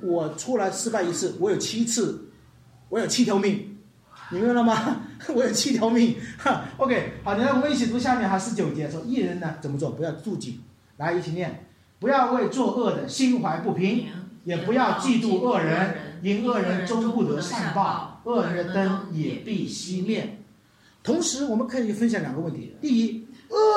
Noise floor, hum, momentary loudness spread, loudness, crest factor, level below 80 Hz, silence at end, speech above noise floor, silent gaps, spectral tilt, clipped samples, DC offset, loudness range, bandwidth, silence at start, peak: -57 dBFS; none; 9 LU; -25 LUFS; 16 dB; -62 dBFS; 0 s; 33 dB; none; -5 dB/octave; under 0.1%; under 0.1%; 4 LU; 13.5 kHz; 0 s; -8 dBFS